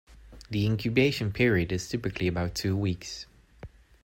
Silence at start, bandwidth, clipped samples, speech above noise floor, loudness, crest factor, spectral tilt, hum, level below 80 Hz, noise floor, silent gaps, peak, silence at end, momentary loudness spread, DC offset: 0.1 s; 16.5 kHz; under 0.1%; 22 dB; -28 LUFS; 18 dB; -6 dB/octave; none; -50 dBFS; -49 dBFS; none; -10 dBFS; 0.35 s; 11 LU; under 0.1%